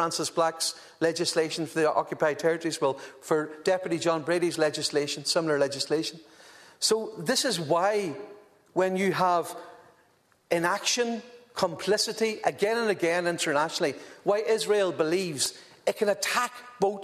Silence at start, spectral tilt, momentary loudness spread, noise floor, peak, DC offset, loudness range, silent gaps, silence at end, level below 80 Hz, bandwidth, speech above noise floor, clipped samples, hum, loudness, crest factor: 0 s; -3 dB/octave; 6 LU; -64 dBFS; -10 dBFS; under 0.1%; 2 LU; none; 0 s; -74 dBFS; 14 kHz; 37 dB; under 0.1%; none; -27 LUFS; 18 dB